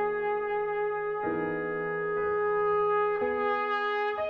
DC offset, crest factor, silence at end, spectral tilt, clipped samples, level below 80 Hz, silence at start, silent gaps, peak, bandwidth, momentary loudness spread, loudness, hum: under 0.1%; 12 dB; 0 s; -7 dB/octave; under 0.1%; -62 dBFS; 0 s; none; -16 dBFS; 5.6 kHz; 5 LU; -29 LUFS; none